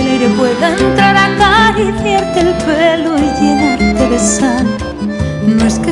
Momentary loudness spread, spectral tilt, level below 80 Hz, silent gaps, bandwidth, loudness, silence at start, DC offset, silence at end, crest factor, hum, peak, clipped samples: 7 LU; -4.5 dB/octave; -28 dBFS; none; 11.5 kHz; -11 LUFS; 0 s; under 0.1%; 0 s; 10 dB; none; 0 dBFS; under 0.1%